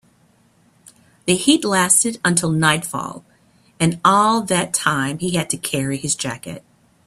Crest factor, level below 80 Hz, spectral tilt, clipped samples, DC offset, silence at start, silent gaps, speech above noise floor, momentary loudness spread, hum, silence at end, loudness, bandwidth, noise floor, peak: 20 dB; -56 dBFS; -3.5 dB/octave; under 0.1%; under 0.1%; 1.25 s; none; 38 dB; 13 LU; none; 0.5 s; -18 LUFS; 15 kHz; -57 dBFS; 0 dBFS